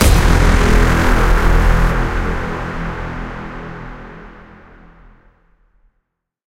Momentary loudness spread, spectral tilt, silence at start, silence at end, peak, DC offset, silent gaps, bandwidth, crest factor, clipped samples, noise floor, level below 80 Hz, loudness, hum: 19 LU; -5.5 dB/octave; 0 s; 2.25 s; 0 dBFS; under 0.1%; none; 16 kHz; 14 dB; under 0.1%; -70 dBFS; -18 dBFS; -16 LUFS; none